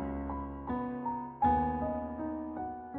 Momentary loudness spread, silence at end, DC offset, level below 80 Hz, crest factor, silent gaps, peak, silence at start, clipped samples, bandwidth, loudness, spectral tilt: 10 LU; 0 s; under 0.1%; -48 dBFS; 18 dB; none; -16 dBFS; 0 s; under 0.1%; 4.1 kHz; -35 LUFS; -8 dB/octave